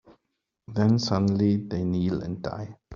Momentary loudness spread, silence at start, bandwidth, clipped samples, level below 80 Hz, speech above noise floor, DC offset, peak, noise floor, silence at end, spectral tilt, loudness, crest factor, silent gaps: 11 LU; 0.1 s; 7.4 kHz; under 0.1%; -56 dBFS; 56 dB; under 0.1%; -8 dBFS; -80 dBFS; 0 s; -7.5 dB/octave; -26 LUFS; 18 dB; none